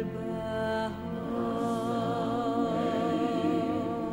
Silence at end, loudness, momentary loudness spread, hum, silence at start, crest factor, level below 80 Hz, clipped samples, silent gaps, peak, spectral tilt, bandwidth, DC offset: 0 s; -30 LUFS; 5 LU; none; 0 s; 14 dB; -56 dBFS; under 0.1%; none; -16 dBFS; -7 dB/octave; 16 kHz; under 0.1%